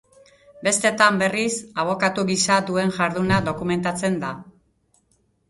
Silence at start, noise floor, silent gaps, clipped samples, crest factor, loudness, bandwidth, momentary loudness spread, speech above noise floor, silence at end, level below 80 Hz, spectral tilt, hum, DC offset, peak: 0.55 s; -65 dBFS; none; under 0.1%; 22 dB; -21 LUFS; 11.5 kHz; 8 LU; 44 dB; 1 s; -54 dBFS; -4 dB/octave; none; under 0.1%; -2 dBFS